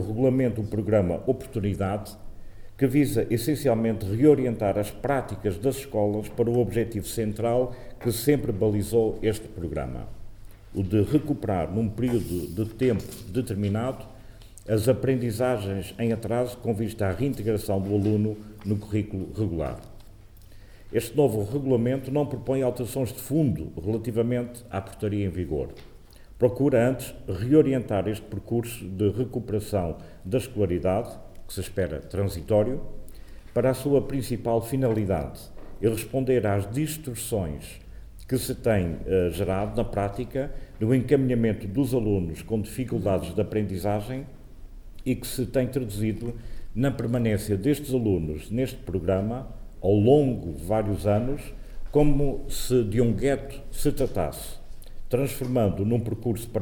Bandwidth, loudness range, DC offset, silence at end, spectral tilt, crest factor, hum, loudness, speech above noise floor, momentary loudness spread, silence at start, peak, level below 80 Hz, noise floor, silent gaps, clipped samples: 19.5 kHz; 4 LU; under 0.1%; 0 s; -7 dB/octave; 18 dB; none; -26 LUFS; 22 dB; 10 LU; 0 s; -6 dBFS; -40 dBFS; -47 dBFS; none; under 0.1%